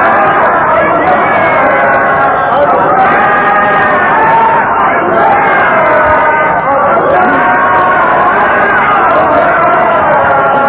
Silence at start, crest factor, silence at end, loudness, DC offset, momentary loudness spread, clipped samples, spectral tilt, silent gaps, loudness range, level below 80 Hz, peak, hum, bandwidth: 0 s; 8 dB; 0 s; -7 LUFS; under 0.1%; 2 LU; 0.8%; -8.5 dB/octave; none; 0 LU; -38 dBFS; 0 dBFS; none; 4 kHz